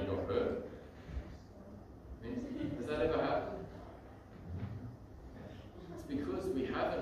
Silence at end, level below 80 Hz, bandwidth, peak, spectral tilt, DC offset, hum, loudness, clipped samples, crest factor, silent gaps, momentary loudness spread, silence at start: 0 s; -54 dBFS; 14.5 kHz; -20 dBFS; -7.5 dB/octave; under 0.1%; none; -39 LUFS; under 0.1%; 20 dB; none; 18 LU; 0 s